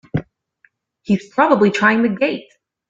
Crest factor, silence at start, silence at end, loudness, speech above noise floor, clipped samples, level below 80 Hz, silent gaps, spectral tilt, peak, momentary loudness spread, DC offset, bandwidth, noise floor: 16 dB; 0.15 s; 0.5 s; -16 LUFS; 43 dB; under 0.1%; -54 dBFS; none; -6.5 dB/octave; -2 dBFS; 13 LU; under 0.1%; 7.8 kHz; -59 dBFS